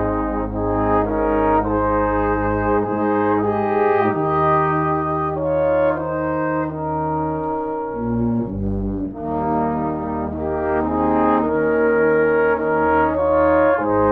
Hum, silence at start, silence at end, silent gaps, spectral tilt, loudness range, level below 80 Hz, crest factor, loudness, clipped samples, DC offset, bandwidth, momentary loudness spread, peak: none; 0 s; 0 s; none; -10.5 dB/octave; 5 LU; -36 dBFS; 14 dB; -19 LUFS; under 0.1%; under 0.1%; 4.6 kHz; 7 LU; -4 dBFS